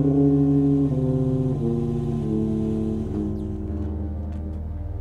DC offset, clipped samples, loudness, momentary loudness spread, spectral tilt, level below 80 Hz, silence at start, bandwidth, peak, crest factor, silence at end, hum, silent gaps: under 0.1%; under 0.1%; -24 LUFS; 12 LU; -11 dB/octave; -34 dBFS; 0 s; 6.4 kHz; -8 dBFS; 14 dB; 0 s; none; none